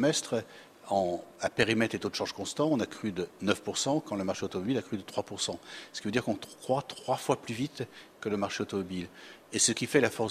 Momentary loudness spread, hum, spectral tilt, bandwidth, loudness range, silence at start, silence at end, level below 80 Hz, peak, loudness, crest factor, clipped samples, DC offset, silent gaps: 11 LU; none; -3.5 dB/octave; 15.5 kHz; 3 LU; 0 s; 0 s; -66 dBFS; -8 dBFS; -31 LUFS; 24 dB; under 0.1%; under 0.1%; none